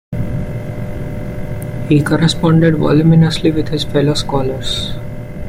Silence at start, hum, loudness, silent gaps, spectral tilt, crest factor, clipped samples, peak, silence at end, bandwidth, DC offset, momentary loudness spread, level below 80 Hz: 0.1 s; none; -15 LUFS; none; -6.5 dB/octave; 12 dB; under 0.1%; -2 dBFS; 0 s; 14.5 kHz; under 0.1%; 14 LU; -30 dBFS